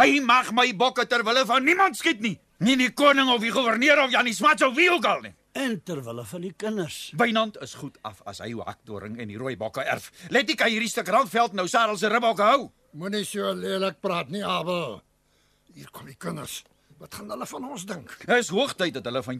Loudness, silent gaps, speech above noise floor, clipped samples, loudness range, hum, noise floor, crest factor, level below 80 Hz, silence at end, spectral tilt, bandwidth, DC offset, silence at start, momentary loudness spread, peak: -23 LUFS; none; 41 dB; under 0.1%; 11 LU; none; -65 dBFS; 18 dB; -66 dBFS; 0 s; -3.5 dB/octave; 14.5 kHz; under 0.1%; 0 s; 18 LU; -6 dBFS